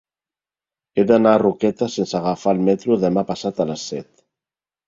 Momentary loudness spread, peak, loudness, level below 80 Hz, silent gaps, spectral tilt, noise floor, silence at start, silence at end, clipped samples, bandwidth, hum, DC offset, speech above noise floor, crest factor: 11 LU; -2 dBFS; -19 LUFS; -58 dBFS; none; -6.5 dB/octave; under -90 dBFS; 0.95 s; 0.85 s; under 0.1%; 7.8 kHz; none; under 0.1%; over 72 dB; 18 dB